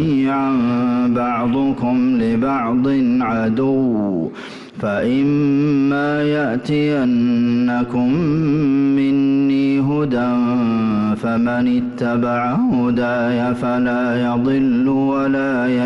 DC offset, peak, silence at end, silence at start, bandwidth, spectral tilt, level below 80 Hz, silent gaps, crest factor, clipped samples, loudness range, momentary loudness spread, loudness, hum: under 0.1%; -10 dBFS; 0 s; 0 s; 6.4 kHz; -8.5 dB/octave; -50 dBFS; none; 6 dB; under 0.1%; 1 LU; 3 LU; -17 LUFS; none